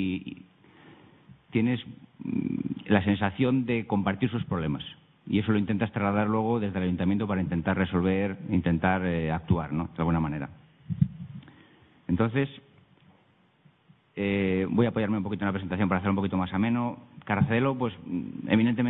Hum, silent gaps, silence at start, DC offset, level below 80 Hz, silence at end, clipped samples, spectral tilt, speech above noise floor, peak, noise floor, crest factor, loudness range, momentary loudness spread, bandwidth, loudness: none; none; 0 s; under 0.1%; -52 dBFS; 0 s; under 0.1%; -11.5 dB/octave; 37 dB; -6 dBFS; -63 dBFS; 22 dB; 4 LU; 11 LU; 4 kHz; -28 LUFS